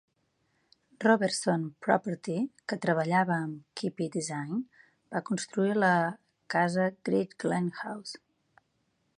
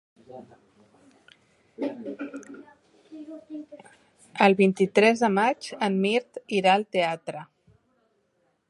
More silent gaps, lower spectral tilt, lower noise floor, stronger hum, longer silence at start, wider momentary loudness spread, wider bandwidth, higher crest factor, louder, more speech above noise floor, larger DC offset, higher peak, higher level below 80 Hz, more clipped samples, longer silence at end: neither; about the same, -5.5 dB/octave vs -5.5 dB/octave; first, -75 dBFS vs -71 dBFS; neither; first, 1 s vs 0.3 s; second, 12 LU vs 24 LU; about the same, 11.5 kHz vs 11.5 kHz; about the same, 22 dB vs 24 dB; second, -30 LUFS vs -24 LUFS; about the same, 46 dB vs 47 dB; neither; second, -10 dBFS vs -4 dBFS; about the same, -76 dBFS vs -76 dBFS; neither; second, 1 s vs 1.25 s